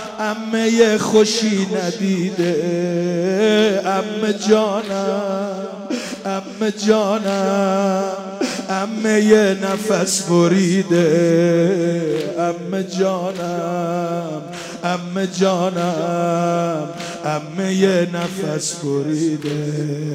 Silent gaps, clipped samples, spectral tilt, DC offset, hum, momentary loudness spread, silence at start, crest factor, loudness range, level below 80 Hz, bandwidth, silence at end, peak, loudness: none; under 0.1%; -5 dB/octave; under 0.1%; none; 9 LU; 0 s; 16 dB; 5 LU; -64 dBFS; 15.5 kHz; 0 s; -2 dBFS; -18 LUFS